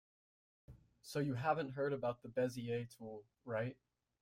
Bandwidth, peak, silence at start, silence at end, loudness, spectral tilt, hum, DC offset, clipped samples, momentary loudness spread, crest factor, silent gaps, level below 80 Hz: 16 kHz; -22 dBFS; 0.7 s; 0.5 s; -41 LUFS; -6.5 dB/octave; none; under 0.1%; under 0.1%; 14 LU; 20 dB; none; -74 dBFS